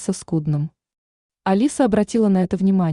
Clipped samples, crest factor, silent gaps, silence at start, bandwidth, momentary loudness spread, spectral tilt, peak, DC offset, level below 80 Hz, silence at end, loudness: under 0.1%; 14 dB; 0.98-1.29 s; 0 s; 11 kHz; 7 LU; -7 dB/octave; -4 dBFS; under 0.1%; -52 dBFS; 0 s; -20 LUFS